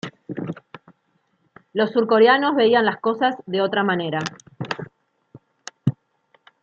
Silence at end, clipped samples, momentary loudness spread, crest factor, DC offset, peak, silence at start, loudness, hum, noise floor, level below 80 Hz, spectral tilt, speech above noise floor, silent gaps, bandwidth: 0.7 s; under 0.1%; 19 LU; 18 dB; under 0.1%; -4 dBFS; 0.05 s; -20 LUFS; none; -67 dBFS; -68 dBFS; -6 dB/octave; 49 dB; none; 7.6 kHz